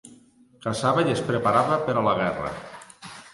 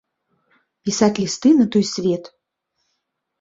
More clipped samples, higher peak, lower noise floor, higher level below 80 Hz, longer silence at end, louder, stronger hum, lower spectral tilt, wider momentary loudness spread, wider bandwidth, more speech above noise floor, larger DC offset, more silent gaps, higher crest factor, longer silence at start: neither; second, -6 dBFS vs -2 dBFS; second, -54 dBFS vs -75 dBFS; about the same, -56 dBFS vs -60 dBFS; second, 0.05 s vs 1.15 s; second, -24 LUFS vs -18 LUFS; neither; about the same, -5.5 dB/octave vs -5 dB/octave; first, 20 LU vs 11 LU; first, 11.5 kHz vs 8 kHz; second, 31 dB vs 58 dB; neither; neither; about the same, 18 dB vs 18 dB; second, 0.05 s vs 0.85 s